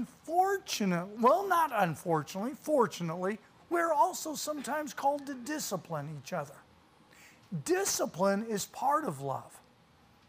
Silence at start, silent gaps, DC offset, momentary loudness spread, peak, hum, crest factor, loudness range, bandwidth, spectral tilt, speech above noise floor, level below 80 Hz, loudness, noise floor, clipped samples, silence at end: 0 s; none; under 0.1%; 11 LU; -14 dBFS; none; 20 dB; 6 LU; 16 kHz; -4.5 dB/octave; 31 dB; -74 dBFS; -32 LUFS; -63 dBFS; under 0.1%; 0.7 s